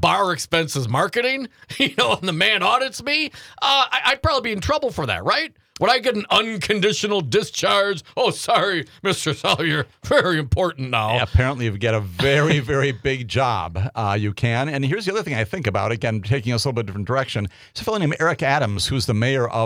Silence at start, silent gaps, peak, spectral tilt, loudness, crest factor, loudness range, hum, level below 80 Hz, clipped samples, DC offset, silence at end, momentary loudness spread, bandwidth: 0 s; none; -2 dBFS; -4.5 dB/octave; -20 LUFS; 18 dB; 3 LU; none; -42 dBFS; under 0.1%; under 0.1%; 0 s; 6 LU; 16.5 kHz